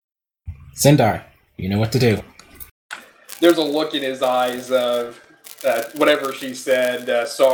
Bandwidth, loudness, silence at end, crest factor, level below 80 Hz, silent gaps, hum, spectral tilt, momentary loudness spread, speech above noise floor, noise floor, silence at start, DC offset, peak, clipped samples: 19 kHz; -19 LUFS; 0 s; 20 dB; -50 dBFS; 2.71-2.89 s; none; -5 dB/octave; 21 LU; 20 dB; -38 dBFS; 0.45 s; under 0.1%; 0 dBFS; under 0.1%